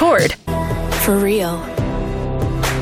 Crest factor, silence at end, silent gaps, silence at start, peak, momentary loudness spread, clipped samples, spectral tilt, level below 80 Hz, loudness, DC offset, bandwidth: 14 dB; 0 s; none; 0 s; -4 dBFS; 7 LU; under 0.1%; -5 dB/octave; -28 dBFS; -18 LUFS; under 0.1%; 16.5 kHz